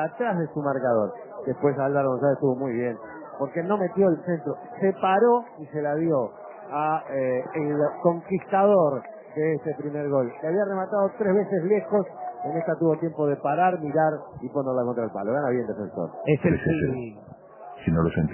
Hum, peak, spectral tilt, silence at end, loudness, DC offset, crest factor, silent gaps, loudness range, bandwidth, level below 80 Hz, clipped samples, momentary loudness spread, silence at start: none; -8 dBFS; -12 dB/octave; 0 s; -25 LUFS; under 0.1%; 18 dB; none; 2 LU; 3.2 kHz; -52 dBFS; under 0.1%; 10 LU; 0 s